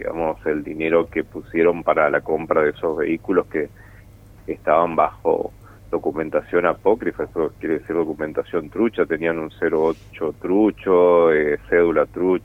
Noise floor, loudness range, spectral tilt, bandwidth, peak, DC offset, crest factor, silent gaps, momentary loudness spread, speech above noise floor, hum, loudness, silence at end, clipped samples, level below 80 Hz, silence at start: -45 dBFS; 4 LU; -8 dB/octave; 4.1 kHz; -2 dBFS; under 0.1%; 18 dB; none; 9 LU; 25 dB; none; -20 LUFS; 0.05 s; under 0.1%; -48 dBFS; 0 s